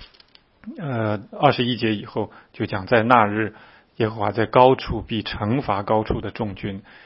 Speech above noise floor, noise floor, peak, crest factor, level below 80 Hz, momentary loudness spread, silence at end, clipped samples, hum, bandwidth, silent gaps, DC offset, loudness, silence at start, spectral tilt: 33 dB; -54 dBFS; 0 dBFS; 22 dB; -44 dBFS; 14 LU; 0.25 s; under 0.1%; none; 5.8 kHz; none; under 0.1%; -21 LUFS; 0 s; -9.5 dB/octave